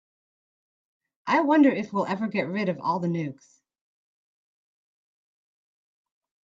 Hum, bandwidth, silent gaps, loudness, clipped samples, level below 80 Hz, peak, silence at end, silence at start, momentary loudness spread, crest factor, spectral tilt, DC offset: none; 7.6 kHz; none; -25 LUFS; under 0.1%; -76 dBFS; -8 dBFS; 3.1 s; 1.25 s; 11 LU; 20 dB; -7.5 dB/octave; under 0.1%